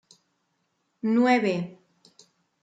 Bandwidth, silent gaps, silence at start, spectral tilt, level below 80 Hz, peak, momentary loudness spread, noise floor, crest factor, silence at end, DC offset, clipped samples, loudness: 9 kHz; none; 1.05 s; -6.5 dB/octave; -78 dBFS; -8 dBFS; 12 LU; -74 dBFS; 20 dB; 0.9 s; under 0.1%; under 0.1%; -24 LUFS